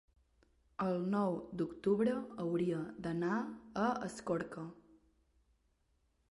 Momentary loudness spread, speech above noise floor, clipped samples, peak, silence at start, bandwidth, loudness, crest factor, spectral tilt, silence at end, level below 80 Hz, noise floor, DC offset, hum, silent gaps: 9 LU; 40 dB; under 0.1%; -22 dBFS; 0.8 s; 11.5 kHz; -37 LUFS; 16 dB; -7.5 dB/octave; 1.55 s; -70 dBFS; -77 dBFS; under 0.1%; none; none